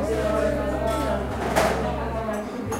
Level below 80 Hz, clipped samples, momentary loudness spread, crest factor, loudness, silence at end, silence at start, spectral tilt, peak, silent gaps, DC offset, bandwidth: -34 dBFS; under 0.1%; 6 LU; 20 dB; -25 LUFS; 0 s; 0 s; -5.5 dB/octave; -6 dBFS; none; 0.1%; 16 kHz